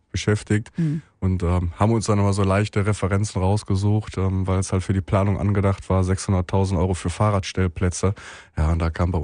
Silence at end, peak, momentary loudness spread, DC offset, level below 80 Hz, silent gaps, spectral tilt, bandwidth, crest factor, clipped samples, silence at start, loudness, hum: 0 s; -6 dBFS; 5 LU; under 0.1%; -38 dBFS; none; -6.5 dB/octave; 10.5 kHz; 16 dB; under 0.1%; 0.15 s; -22 LUFS; none